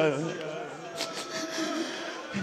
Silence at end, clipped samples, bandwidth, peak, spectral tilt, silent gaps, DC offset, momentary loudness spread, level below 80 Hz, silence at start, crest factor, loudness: 0 s; under 0.1%; 15.5 kHz; -12 dBFS; -4 dB/octave; none; under 0.1%; 6 LU; -76 dBFS; 0 s; 20 dB; -33 LUFS